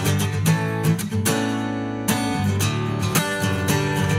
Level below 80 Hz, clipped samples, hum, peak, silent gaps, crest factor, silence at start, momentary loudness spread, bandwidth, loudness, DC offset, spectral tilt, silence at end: -48 dBFS; under 0.1%; none; -4 dBFS; none; 18 dB; 0 s; 3 LU; 16.5 kHz; -22 LUFS; under 0.1%; -5 dB/octave; 0 s